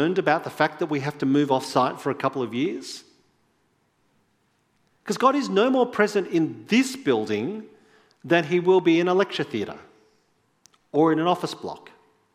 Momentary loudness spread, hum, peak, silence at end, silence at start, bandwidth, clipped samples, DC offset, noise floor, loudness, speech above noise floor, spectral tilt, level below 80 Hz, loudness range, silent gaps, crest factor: 14 LU; none; -4 dBFS; 0.55 s; 0 s; 15 kHz; under 0.1%; under 0.1%; -68 dBFS; -23 LUFS; 45 dB; -5.5 dB/octave; -74 dBFS; 6 LU; none; 20 dB